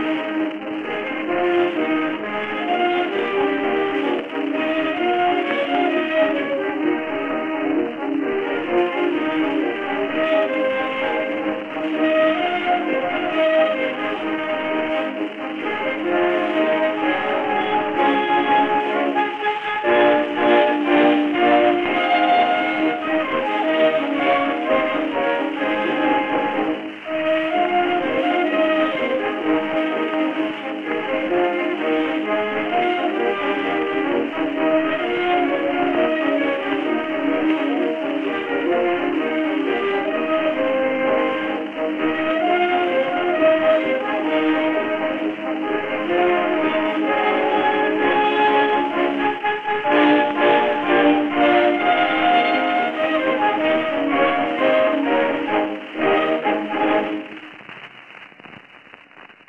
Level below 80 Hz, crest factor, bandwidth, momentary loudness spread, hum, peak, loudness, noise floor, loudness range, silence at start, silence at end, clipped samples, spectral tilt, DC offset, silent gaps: -62 dBFS; 16 dB; 6.6 kHz; 7 LU; none; -2 dBFS; -20 LUFS; -45 dBFS; 4 LU; 0 s; 0.2 s; under 0.1%; -6 dB/octave; 0.2%; none